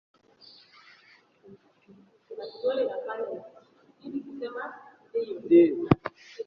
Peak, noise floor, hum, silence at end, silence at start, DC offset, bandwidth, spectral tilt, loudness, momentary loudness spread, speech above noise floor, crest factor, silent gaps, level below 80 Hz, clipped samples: -4 dBFS; -60 dBFS; none; 0.05 s; 1.5 s; under 0.1%; 6 kHz; -9 dB/octave; -27 LUFS; 22 LU; 33 dB; 26 dB; none; -64 dBFS; under 0.1%